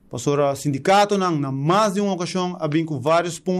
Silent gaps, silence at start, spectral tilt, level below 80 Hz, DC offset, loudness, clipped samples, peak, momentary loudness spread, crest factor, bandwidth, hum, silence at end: none; 0.1 s; -5.5 dB/octave; -60 dBFS; under 0.1%; -20 LUFS; under 0.1%; -8 dBFS; 6 LU; 12 dB; 15 kHz; none; 0 s